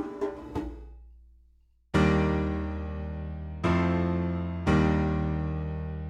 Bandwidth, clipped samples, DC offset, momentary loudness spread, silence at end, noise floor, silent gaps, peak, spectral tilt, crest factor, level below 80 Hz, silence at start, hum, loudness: 9.2 kHz; under 0.1%; under 0.1%; 13 LU; 0 s; -62 dBFS; none; -12 dBFS; -8 dB/octave; 18 dB; -38 dBFS; 0 s; none; -29 LUFS